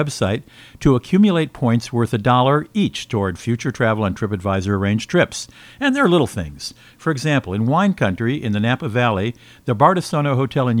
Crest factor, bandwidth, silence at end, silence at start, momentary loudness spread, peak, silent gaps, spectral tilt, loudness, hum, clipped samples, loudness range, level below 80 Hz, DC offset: 18 dB; 15 kHz; 0 s; 0 s; 9 LU; 0 dBFS; none; -6.5 dB/octave; -19 LUFS; none; under 0.1%; 2 LU; -46 dBFS; under 0.1%